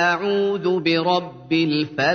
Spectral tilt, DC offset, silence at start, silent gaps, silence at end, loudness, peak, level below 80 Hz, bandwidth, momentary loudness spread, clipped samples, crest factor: -6 dB/octave; under 0.1%; 0 s; none; 0 s; -20 LUFS; -6 dBFS; -64 dBFS; 6.6 kHz; 3 LU; under 0.1%; 14 dB